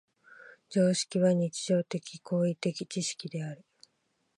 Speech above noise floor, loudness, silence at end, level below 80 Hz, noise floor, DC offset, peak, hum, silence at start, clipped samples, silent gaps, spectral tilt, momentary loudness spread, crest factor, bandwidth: 47 dB; -30 LUFS; 0.8 s; -78 dBFS; -76 dBFS; under 0.1%; -14 dBFS; none; 0.3 s; under 0.1%; none; -5.5 dB/octave; 12 LU; 18 dB; 11.5 kHz